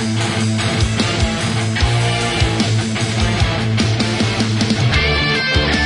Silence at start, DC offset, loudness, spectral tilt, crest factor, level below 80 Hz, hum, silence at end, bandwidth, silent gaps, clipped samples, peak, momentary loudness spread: 0 s; under 0.1%; -16 LUFS; -4.5 dB/octave; 14 dB; -28 dBFS; none; 0 s; 11 kHz; none; under 0.1%; -2 dBFS; 3 LU